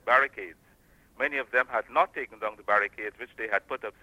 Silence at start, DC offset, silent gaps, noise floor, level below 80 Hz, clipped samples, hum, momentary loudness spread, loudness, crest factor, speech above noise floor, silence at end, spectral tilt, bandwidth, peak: 0.05 s; under 0.1%; none; -60 dBFS; -66 dBFS; under 0.1%; none; 12 LU; -28 LUFS; 22 dB; 31 dB; 0.1 s; -4 dB/octave; 16 kHz; -8 dBFS